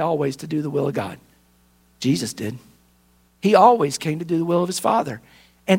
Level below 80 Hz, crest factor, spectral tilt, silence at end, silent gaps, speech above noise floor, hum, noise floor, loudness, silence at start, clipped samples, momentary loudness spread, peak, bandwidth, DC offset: -62 dBFS; 22 dB; -5.5 dB/octave; 0 s; none; 38 dB; none; -59 dBFS; -21 LUFS; 0 s; under 0.1%; 17 LU; 0 dBFS; 16.5 kHz; under 0.1%